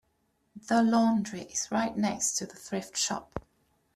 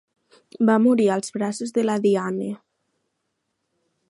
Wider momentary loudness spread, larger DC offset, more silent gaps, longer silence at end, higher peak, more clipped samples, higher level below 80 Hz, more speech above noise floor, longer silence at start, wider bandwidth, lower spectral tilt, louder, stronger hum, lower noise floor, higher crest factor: about the same, 13 LU vs 12 LU; neither; neither; second, 0.55 s vs 1.55 s; second, -14 dBFS vs -6 dBFS; neither; first, -62 dBFS vs -74 dBFS; second, 45 dB vs 56 dB; about the same, 0.55 s vs 0.6 s; first, 14 kHz vs 11.5 kHz; second, -3.5 dB/octave vs -6 dB/octave; second, -29 LUFS vs -21 LUFS; neither; about the same, -74 dBFS vs -76 dBFS; about the same, 16 dB vs 18 dB